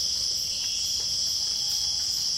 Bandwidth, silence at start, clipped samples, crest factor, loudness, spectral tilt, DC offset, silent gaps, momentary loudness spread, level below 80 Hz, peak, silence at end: 16.5 kHz; 0 s; under 0.1%; 14 dB; -24 LUFS; 1.5 dB/octave; under 0.1%; none; 1 LU; -54 dBFS; -14 dBFS; 0 s